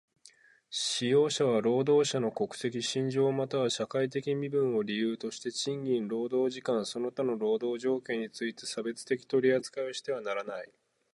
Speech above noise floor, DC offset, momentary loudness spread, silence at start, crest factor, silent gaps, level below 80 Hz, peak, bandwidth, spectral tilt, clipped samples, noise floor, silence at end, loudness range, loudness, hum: 30 dB; under 0.1%; 10 LU; 0.7 s; 16 dB; none; -78 dBFS; -14 dBFS; 11.5 kHz; -4.5 dB/octave; under 0.1%; -60 dBFS; 0.5 s; 4 LU; -31 LUFS; none